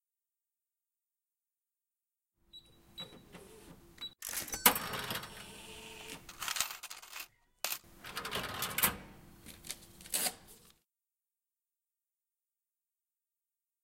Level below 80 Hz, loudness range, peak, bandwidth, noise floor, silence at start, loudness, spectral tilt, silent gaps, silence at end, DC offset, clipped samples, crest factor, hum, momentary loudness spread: -66 dBFS; 17 LU; -6 dBFS; 17 kHz; under -90 dBFS; 2.55 s; -36 LUFS; -1 dB/octave; none; 3.15 s; under 0.1%; under 0.1%; 36 dB; none; 24 LU